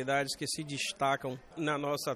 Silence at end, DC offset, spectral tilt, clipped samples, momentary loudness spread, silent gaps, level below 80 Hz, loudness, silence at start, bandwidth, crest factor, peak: 0 s; under 0.1%; -3.5 dB/octave; under 0.1%; 4 LU; none; -68 dBFS; -34 LUFS; 0 s; 14.5 kHz; 16 dB; -18 dBFS